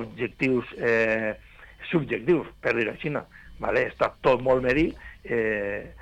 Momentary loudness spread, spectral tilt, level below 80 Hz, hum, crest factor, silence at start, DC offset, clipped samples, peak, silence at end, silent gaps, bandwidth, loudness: 10 LU; -7 dB/octave; -48 dBFS; none; 16 dB; 0 s; under 0.1%; under 0.1%; -10 dBFS; 0.05 s; none; 9.2 kHz; -26 LUFS